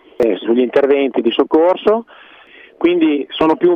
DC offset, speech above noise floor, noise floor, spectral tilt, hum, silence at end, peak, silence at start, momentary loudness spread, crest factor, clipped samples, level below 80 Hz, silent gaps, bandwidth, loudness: under 0.1%; 29 dB; -42 dBFS; -7 dB/octave; none; 0 s; -4 dBFS; 0.2 s; 4 LU; 12 dB; under 0.1%; -54 dBFS; none; 5.6 kHz; -15 LUFS